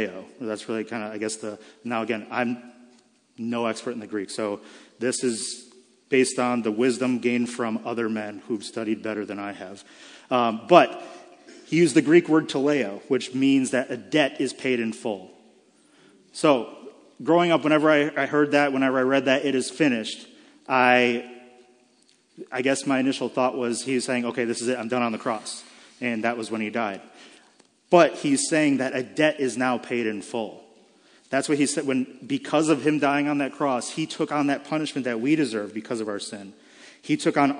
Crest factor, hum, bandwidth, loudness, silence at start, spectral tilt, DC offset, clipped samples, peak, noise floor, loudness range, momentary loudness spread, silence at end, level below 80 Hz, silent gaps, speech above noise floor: 24 dB; none; 10.5 kHz; -24 LUFS; 0 s; -4.5 dB/octave; under 0.1%; under 0.1%; 0 dBFS; -61 dBFS; 8 LU; 13 LU; 0 s; -80 dBFS; none; 38 dB